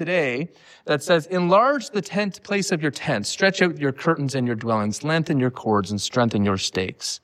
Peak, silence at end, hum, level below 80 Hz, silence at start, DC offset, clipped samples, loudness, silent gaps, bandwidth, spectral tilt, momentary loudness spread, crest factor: -4 dBFS; 0.05 s; none; -62 dBFS; 0 s; under 0.1%; under 0.1%; -22 LUFS; none; 15 kHz; -5 dB/octave; 7 LU; 18 dB